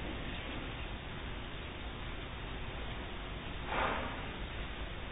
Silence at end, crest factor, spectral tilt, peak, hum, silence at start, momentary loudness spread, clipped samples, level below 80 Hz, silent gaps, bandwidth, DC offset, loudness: 0 s; 18 dB; -2.5 dB/octave; -22 dBFS; none; 0 s; 8 LU; under 0.1%; -46 dBFS; none; 3.9 kHz; under 0.1%; -41 LUFS